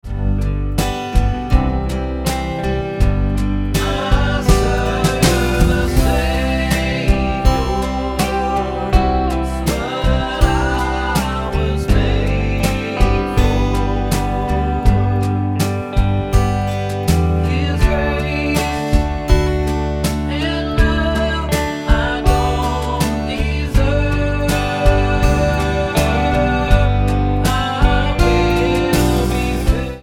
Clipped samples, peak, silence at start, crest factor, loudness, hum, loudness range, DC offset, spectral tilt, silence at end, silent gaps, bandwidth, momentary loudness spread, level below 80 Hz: under 0.1%; 0 dBFS; 0.05 s; 16 dB; -17 LUFS; none; 2 LU; under 0.1%; -6 dB/octave; 0 s; none; 16.5 kHz; 4 LU; -20 dBFS